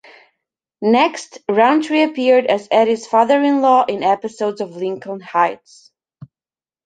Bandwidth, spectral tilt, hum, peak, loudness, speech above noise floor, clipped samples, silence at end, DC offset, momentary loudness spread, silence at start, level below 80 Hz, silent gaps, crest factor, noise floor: 9.2 kHz; -5 dB/octave; none; -2 dBFS; -16 LUFS; over 74 dB; under 0.1%; 0.6 s; under 0.1%; 11 LU; 0.8 s; -68 dBFS; none; 16 dB; under -90 dBFS